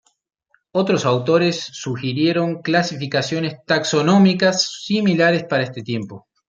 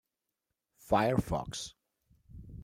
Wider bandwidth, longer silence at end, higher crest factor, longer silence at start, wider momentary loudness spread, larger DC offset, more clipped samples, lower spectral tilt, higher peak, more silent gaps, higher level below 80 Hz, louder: second, 7.6 kHz vs 16 kHz; first, 0.3 s vs 0 s; second, 16 dB vs 22 dB; about the same, 0.75 s vs 0.85 s; second, 11 LU vs 21 LU; neither; neither; about the same, -5 dB/octave vs -5.5 dB/octave; first, -2 dBFS vs -12 dBFS; neither; second, -64 dBFS vs -52 dBFS; first, -19 LUFS vs -32 LUFS